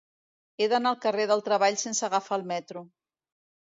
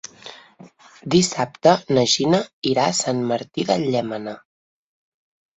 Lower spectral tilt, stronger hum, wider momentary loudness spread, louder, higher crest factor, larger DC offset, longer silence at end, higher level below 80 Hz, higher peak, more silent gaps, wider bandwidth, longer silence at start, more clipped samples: second, -2.5 dB/octave vs -4.5 dB/octave; neither; second, 10 LU vs 20 LU; second, -27 LUFS vs -20 LUFS; about the same, 18 dB vs 20 dB; neither; second, 0.85 s vs 1.2 s; second, -84 dBFS vs -60 dBFS; second, -12 dBFS vs -2 dBFS; second, none vs 2.53-2.62 s; about the same, 7.8 kHz vs 8.4 kHz; first, 0.6 s vs 0.25 s; neither